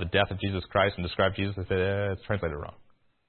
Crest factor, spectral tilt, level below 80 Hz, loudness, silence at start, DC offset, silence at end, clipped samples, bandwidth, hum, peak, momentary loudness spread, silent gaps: 22 dB; -10 dB/octave; -50 dBFS; -28 LUFS; 0 s; under 0.1%; 0.45 s; under 0.1%; 4.4 kHz; none; -8 dBFS; 7 LU; none